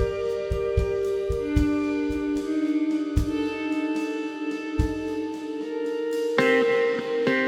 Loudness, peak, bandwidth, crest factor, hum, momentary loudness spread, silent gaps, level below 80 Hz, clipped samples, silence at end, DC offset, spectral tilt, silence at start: -26 LUFS; -6 dBFS; 13.5 kHz; 18 dB; none; 8 LU; none; -36 dBFS; under 0.1%; 0 s; under 0.1%; -6.5 dB/octave; 0 s